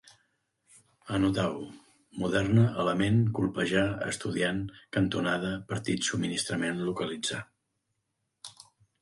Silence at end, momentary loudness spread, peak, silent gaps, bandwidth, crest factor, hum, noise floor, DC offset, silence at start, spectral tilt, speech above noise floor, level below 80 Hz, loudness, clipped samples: 0.5 s; 14 LU; -12 dBFS; none; 11.5 kHz; 18 dB; none; -81 dBFS; under 0.1%; 1.05 s; -5.5 dB/octave; 52 dB; -56 dBFS; -29 LUFS; under 0.1%